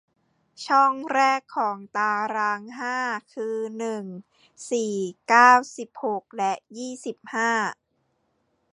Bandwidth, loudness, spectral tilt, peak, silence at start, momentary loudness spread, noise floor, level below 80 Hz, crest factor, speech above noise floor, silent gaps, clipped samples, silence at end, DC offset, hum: 11 kHz; -23 LUFS; -3.5 dB/octave; -2 dBFS; 0.6 s; 16 LU; -72 dBFS; -78 dBFS; 22 dB; 48 dB; none; under 0.1%; 1 s; under 0.1%; none